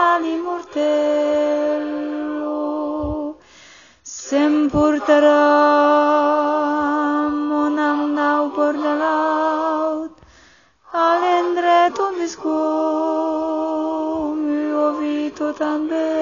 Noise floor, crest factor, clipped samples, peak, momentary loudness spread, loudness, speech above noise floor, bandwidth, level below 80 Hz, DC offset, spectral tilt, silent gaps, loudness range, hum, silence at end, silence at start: -51 dBFS; 16 dB; under 0.1%; -4 dBFS; 10 LU; -19 LUFS; 36 dB; 7.2 kHz; -50 dBFS; under 0.1%; -3 dB/octave; none; 6 LU; none; 0 s; 0 s